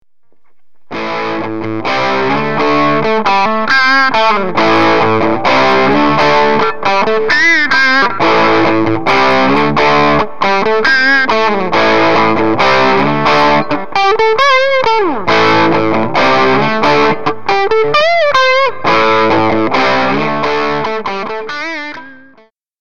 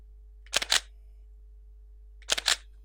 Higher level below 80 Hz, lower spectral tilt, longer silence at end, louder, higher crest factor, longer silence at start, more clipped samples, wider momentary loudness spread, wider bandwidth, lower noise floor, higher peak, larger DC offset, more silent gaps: about the same, -48 dBFS vs -50 dBFS; first, -5 dB/octave vs 1 dB/octave; second, 0 s vs 0.25 s; first, -10 LUFS vs -27 LUFS; second, 12 dB vs 30 dB; second, 0 s vs 0.35 s; neither; first, 8 LU vs 5 LU; second, 9.2 kHz vs 18 kHz; about the same, -49 dBFS vs -50 dBFS; first, 0 dBFS vs -4 dBFS; first, 9% vs under 0.1%; neither